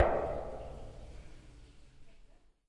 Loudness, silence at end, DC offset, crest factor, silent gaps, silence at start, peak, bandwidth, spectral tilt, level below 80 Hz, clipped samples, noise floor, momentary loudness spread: -38 LUFS; 0.35 s; under 0.1%; 24 dB; none; 0 s; -12 dBFS; 11 kHz; -7.5 dB/octave; -50 dBFS; under 0.1%; -60 dBFS; 24 LU